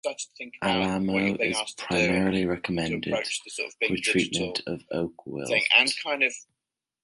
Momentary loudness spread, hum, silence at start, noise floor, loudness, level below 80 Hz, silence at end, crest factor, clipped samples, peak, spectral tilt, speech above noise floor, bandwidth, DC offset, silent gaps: 13 LU; none; 0.05 s; -87 dBFS; -25 LUFS; -56 dBFS; 0.6 s; 22 dB; under 0.1%; -4 dBFS; -3.5 dB/octave; 60 dB; 11.5 kHz; under 0.1%; none